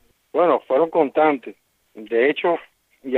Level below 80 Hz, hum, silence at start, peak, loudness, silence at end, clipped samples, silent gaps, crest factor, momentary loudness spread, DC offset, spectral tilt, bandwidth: -74 dBFS; none; 0.35 s; -4 dBFS; -20 LUFS; 0 s; under 0.1%; none; 18 dB; 10 LU; under 0.1%; -7 dB/octave; 4.2 kHz